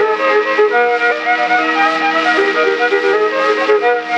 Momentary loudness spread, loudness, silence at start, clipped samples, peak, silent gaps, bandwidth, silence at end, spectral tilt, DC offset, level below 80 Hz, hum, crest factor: 2 LU; -13 LUFS; 0 s; under 0.1%; 0 dBFS; none; 9 kHz; 0 s; -3 dB/octave; under 0.1%; -70 dBFS; none; 12 dB